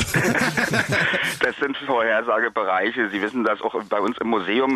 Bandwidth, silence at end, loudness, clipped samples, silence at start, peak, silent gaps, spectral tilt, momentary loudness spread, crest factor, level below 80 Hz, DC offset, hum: 14 kHz; 0 s; -21 LUFS; under 0.1%; 0 s; -8 dBFS; none; -4.5 dB/octave; 4 LU; 14 dB; -50 dBFS; under 0.1%; none